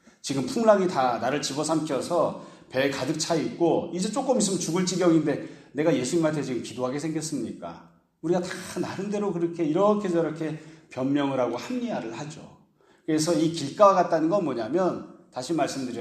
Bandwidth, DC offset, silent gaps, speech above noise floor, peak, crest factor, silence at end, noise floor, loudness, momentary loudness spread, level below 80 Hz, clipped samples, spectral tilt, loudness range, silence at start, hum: 14 kHz; under 0.1%; none; 35 dB; -6 dBFS; 20 dB; 0 s; -60 dBFS; -26 LUFS; 14 LU; -68 dBFS; under 0.1%; -5 dB/octave; 4 LU; 0.25 s; none